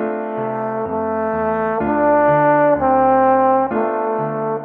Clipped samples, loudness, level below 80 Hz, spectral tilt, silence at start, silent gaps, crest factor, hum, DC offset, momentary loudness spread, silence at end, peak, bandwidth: under 0.1%; -17 LUFS; -46 dBFS; -10.5 dB/octave; 0 s; none; 14 dB; none; under 0.1%; 9 LU; 0 s; -4 dBFS; 3.8 kHz